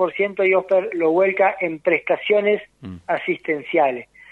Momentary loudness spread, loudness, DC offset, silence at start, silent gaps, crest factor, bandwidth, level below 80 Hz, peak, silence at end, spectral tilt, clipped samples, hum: 7 LU; -20 LUFS; under 0.1%; 0 s; none; 16 dB; 4.3 kHz; -64 dBFS; -4 dBFS; 0.3 s; -7 dB/octave; under 0.1%; none